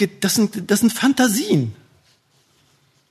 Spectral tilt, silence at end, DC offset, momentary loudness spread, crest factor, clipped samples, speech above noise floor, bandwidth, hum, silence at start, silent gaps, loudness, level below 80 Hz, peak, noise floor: -4 dB/octave; 1.4 s; under 0.1%; 4 LU; 16 dB; under 0.1%; 42 dB; 13.5 kHz; none; 0 s; none; -18 LUFS; -64 dBFS; -4 dBFS; -60 dBFS